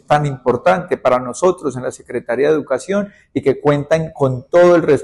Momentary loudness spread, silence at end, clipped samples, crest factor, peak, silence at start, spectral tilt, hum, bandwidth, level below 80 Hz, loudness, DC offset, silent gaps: 11 LU; 0 s; under 0.1%; 12 dB; -4 dBFS; 0.1 s; -6.5 dB/octave; none; 11.5 kHz; -50 dBFS; -16 LUFS; under 0.1%; none